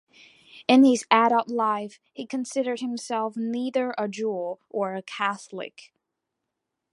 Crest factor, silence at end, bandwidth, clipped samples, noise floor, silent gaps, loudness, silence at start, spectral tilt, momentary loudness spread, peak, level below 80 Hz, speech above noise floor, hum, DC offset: 22 dB; 1.25 s; 11.5 kHz; under 0.1%; -83 dBFS; none; -25 LUFS; 0.55 s; -4 dB/octave; 16 LU; -2 dBFS; -80 dBFS; 58 dB; none; under 0.1%